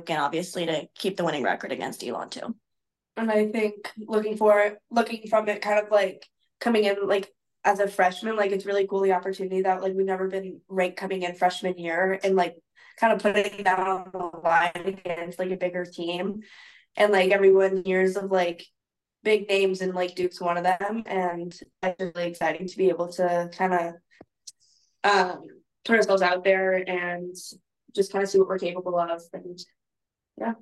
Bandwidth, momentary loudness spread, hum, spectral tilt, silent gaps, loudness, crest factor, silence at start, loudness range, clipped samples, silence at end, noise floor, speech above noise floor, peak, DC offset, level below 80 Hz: 12.5 kHz; 12 LU; none; -5 dB/octave; none; -25 LUFS; 18 dB; 0 s; 4 LU; under 0.1%; 0.05 s; -86 dBFS; 61 dB; -6 dBFS; under 0.1%; -72 dBFS